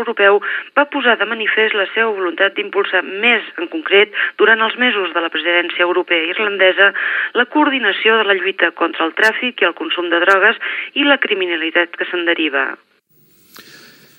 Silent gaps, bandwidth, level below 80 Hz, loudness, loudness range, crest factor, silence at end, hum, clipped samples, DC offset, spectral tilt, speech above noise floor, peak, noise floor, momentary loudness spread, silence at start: none; 16.5 kHz; -80 dBFS; -14 LUFS; 2 LU; 16 dB; 0.55 s; none; under 0.1%; under 0.1%; -3.5 dB/octave; 38 dB; 0 dBFS; -54 dBFS; 5 LU; 0 s